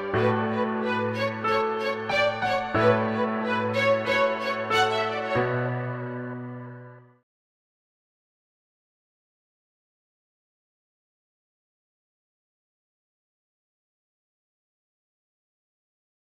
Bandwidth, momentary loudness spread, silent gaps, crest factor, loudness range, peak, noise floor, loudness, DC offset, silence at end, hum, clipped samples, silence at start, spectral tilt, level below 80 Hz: 15.5 kHz; 12 LU; none; 20 dB; 13 LU; -10 dBFS; -46 dBFS; -25 LUFS; under 0.1%; 9.3 s; none; under 0.1%; 0 s; -6 dB/octave; -62 dBFS